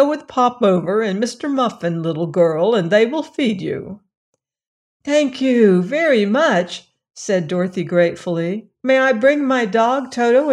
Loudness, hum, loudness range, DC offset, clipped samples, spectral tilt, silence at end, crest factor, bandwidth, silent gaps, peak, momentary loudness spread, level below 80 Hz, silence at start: -17 LUFS; none; 2 LU; under 0.1%; under 0.1%; -6 dB/octave; 0 s; 14 dB; 11 kHz; 4.17-4.33 s, 4.67-5.00 s; -2 dBFS; 9 LU; -64 dBFS; 0 s